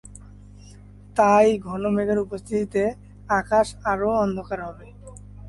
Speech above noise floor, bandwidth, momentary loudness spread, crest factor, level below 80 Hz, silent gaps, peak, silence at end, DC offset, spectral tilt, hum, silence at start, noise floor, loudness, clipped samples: 23 dB; 11.5 kHz; 19 LU; 18 dB; -46 dBFS; none; -6 dBFS; 0 s; under 0.1%; -6 dB/octave; 50 Hz at -40 dBFS; 0.05 s; -45 dBFS; -22 LUFS; under 0.1%